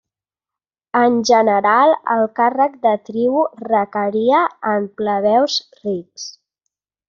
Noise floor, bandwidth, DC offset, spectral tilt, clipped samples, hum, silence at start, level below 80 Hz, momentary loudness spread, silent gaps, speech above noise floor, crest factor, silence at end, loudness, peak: -89 dBFS; 7.4 kHz; under 0.1%; -2.5 dB/octave; under 0.1%; none; 0.95 s; -66 dBFS; 12 LU; none; 73 dB; 16 dB; 0.75 s; -17 LUFS; -2 dBFS